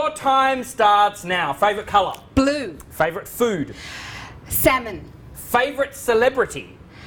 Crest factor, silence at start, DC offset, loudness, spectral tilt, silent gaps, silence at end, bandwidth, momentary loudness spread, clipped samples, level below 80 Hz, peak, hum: 18 dB; 0 s; under 0.1%; -20 LUFS; -4 dB/octave; none; 0 s; over 20 kHz; 16 LU; under 0.1%; -44 dBFS; -2 dBFS; none